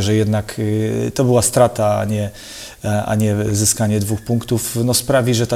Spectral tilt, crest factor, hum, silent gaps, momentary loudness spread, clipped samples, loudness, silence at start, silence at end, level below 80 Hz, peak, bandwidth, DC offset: -5 dB/octave; 16 dB; none; none; 7 LU; under 0.1%; -17 LUFS; 0 s; 0 s; -44 dBFS; 0 dBFS; 16.5 kHz; under 0.1%